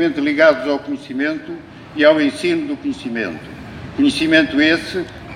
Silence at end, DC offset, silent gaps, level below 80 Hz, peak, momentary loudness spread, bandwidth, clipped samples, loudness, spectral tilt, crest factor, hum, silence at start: 0 s; under 0.1%; none; -48 dBFS; 0 dBFS; 18 LU; 11 kHz; under 0.1%; -17 LUFS; -5 dB/octave; 18 dB; none; 0 s